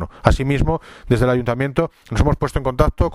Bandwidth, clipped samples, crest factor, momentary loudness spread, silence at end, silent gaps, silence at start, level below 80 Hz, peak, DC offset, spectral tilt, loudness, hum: 13.5 kHz; under 0.1%; 18 dB; 5 LU; 0 s; none; 0 s; -26 dBFS; 0 dBFS; under 0.1%; -7.5 dB/octave; -19 LUFS; none